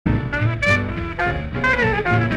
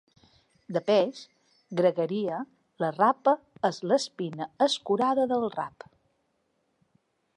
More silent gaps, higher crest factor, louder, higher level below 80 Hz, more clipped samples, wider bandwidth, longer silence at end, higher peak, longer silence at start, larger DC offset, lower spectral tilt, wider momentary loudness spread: neither; about the same, 14 dB vs 18 dB; first, -20 LUFS vs -27 LUFS; first, -32 dBFS vs -76 dBFS; neither; about the same, 10 kHz vs 11 kHz; second, 0 s vs 1.7 s; first, -4 dBFS vs -10 dBFS; second, 0.05 s vs 0.7 s; neither; first, -6.5 dB/octave vs -5 dB/octave; second, 5 LU vs 11 LU